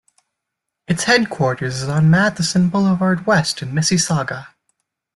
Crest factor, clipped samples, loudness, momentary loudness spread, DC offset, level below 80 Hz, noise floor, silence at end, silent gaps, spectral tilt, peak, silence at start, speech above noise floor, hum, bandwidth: 16 dB; under 0.1%; -17 LUFS; 7 LU; under 0.1%; -52 dBFS; -80 dBFS; 0.7 s; none; -4.5 dB/octave; -2 dBFS; 0.9 s; 63 dB; none; 12 kHz